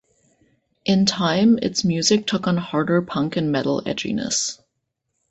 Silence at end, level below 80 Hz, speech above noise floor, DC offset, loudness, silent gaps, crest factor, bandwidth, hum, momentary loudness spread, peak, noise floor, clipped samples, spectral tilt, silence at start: 0.75 s; -56 dBFS; 56 dB; under 0.1%; -20 LUFS; none; 20 dB; 8.4 kHz; none; 7 LU; -2 dBFS; -76 dBFS; under 0.1%; -4.5 dB/octave; 0.85 s